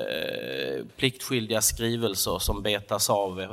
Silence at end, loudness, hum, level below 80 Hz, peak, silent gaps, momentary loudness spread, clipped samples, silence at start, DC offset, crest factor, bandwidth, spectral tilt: 0 s; -27 LUFS; none; -42 dBFS; -8 dBFS; none; 7 LU; under 0.1%; 0 s; under 0.1%; 20 dB; 16.5 kHz; -3 dB/octave